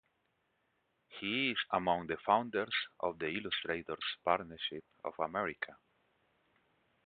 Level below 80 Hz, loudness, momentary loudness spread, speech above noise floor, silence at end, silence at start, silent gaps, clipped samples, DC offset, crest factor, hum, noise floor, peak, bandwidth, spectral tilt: -70 dBFS; -36 LUFS; 11 LU; 43 dB; 1.3 s; 1.1 s; none; under 0.1%; under 0.1%; 24 dB; none; -79 dBFS; -14 dBFS; 4.8 kHz; -1.5 dB/octave